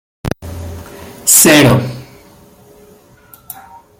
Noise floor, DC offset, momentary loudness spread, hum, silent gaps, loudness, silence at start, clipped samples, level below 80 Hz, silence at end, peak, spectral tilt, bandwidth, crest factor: -44 dBFS; under 0.1%; 27 LU; none; none; -8 LUFS; 0.25 s; 0.1%; -40 dBFS; 1.95 s; 0 dBFS; -3.5 dB/octave; over 20 kHz; 16 dB